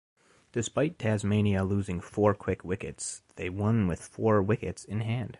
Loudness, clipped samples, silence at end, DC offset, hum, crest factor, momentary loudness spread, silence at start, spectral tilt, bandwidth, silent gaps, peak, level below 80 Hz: -30 LUFS; under 0.1%; 0.05 s; under 0.1%; none; 18 dB; 10 LU; 0.55 s; -6.5 dB/octave; 11.5 kHz; none; -10 dBFS; -48 dBFS